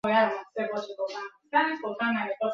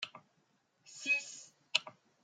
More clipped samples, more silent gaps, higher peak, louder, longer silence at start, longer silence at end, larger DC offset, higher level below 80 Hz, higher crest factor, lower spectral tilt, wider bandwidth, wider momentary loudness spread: neither; neither; about the same, -10 dBFS vs -10 dBFS; first, -29 LUFS vs -35 LUFS; about the same, 0.05 s vs 0 s; second, 0 s vs 0.3 s; neither; first, -72 dBFS vs under -90 dBFS; second, 18 dB vs 30 dB; first, -5.5 dB/octave vs 1 dB/octave; second, 7.4 kHz vs 13.5 kHz; second, 10 LU vs 20 LU